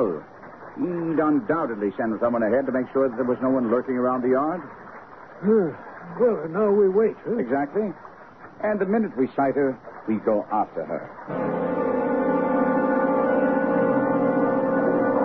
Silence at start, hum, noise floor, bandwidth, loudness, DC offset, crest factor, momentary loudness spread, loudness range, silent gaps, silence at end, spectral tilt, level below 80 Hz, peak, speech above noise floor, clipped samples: 0 s; none; -45 dBFS; 4.8 kHz; -23 LUFS; 0.1%; 14 dB; 11 LU; 3 LU; none; 0 s; -10.5 dB/octave; -62 dBFS; -8 dBFS; 22 dB; under 0.1%